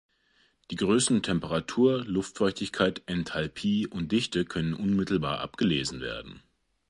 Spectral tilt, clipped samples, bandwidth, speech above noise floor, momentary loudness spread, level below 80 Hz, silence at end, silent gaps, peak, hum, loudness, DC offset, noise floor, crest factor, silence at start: -5 dB/octave; under 0.1%; 11.5 kHz; 40 dB; 8 LU; -54 dBFS; 0.5 s; none; -10 dBFS; none; -28 LUFS; under 0.1%; -67 dBFS; 20 dB; 0.7 s